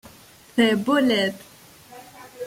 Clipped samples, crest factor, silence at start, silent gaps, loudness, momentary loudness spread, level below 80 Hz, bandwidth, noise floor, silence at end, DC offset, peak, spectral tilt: under 0.1%; 18 dB; 0.55 s; none; -21 LUFS; 23 LU; -64 dBFS; 16.5 kHz; -49 dBFS; 0 s; under 0.1%; -6 dBFS; -4.5 dB/octave